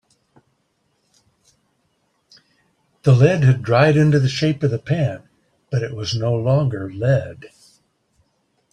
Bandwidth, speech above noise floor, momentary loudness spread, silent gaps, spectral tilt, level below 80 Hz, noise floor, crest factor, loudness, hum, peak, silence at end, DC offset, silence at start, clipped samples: 9.2 kHz; 51 dB; 11 LU; none; -7 dB/octave; -54 dBFS; -67 dBFS; 18 dB; -18 LUFS; none; -2 dBFS; 1.25 s; under 0.1%; 3.05 s; under 0.1%